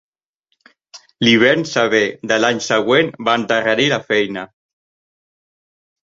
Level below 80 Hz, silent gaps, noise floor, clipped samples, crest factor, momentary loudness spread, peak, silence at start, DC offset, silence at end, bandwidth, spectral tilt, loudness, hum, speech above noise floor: -60 dBFS; none; -71 dBFS; under 0.1%; 18 dB; 6 LU; -2 dBFS; 0.95 s; under 0.1%; 1.7 s; 7.8 kHz; -4 dB/octave; -15 LUFS; none; 55 dB